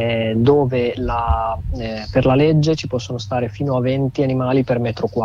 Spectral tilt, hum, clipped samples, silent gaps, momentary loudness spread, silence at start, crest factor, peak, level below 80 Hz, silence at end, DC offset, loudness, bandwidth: -7.5 dB/octave; none; under 0.1%; none; 9 LU; 0 s; 14 dB; -4 dBFS; -32 dBFS; 0 s; under 0.1%; -18 LUFS; 7.6 kHz